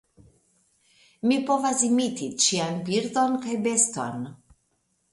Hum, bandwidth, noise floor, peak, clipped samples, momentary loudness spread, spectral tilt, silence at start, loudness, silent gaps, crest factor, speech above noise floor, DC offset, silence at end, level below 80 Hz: none; 11.5 kHz; -72 dBFS; -6 dBFS; under 0.1%; 9 LU; -3 dB/octave; 1.25 s; -24 LUFS; none; 20 dB; 47 dB; under 0.1%; 0.75 s; -68 dBFS